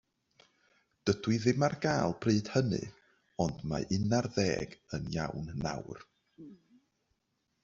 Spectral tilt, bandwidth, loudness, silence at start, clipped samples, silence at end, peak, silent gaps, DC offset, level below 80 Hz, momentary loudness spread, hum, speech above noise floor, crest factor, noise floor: -6 dB/octave; 7.8 kHz; -33 LUFS; 1.05 s; under 0.1%; 1.1 s; -12 dBFS; none; under 0.1%; -58 dBFS; 18 LU; none; 48 dB; 22 dB; -80 dBFS